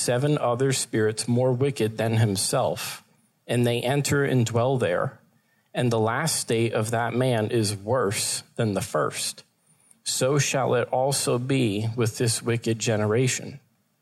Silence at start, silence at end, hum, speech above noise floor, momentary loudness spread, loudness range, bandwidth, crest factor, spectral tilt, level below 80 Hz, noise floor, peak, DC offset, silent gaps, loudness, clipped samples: 0 s; 0.45 s; none; 41 dB; 6 LU; 2 LU; 15 kHz; 14 dB; -4.5 dB/octave; -64 dBFS; -65 dBFS; -10 dBFS; under 0.1%; none; -24 LUFS; under 0.1%